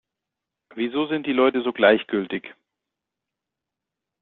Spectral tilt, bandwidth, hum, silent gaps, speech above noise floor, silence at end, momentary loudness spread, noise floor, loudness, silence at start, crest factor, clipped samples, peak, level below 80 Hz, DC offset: -2.5 dB/octave; 4.3 kHz; none; none; 64 dB; 1.7 s; 13 LU; -85 dBFS; -22 LUFS; 0.75 s; 22 dB; under 0.1%; -4 dBFS; -68 dBFS; under 0.1%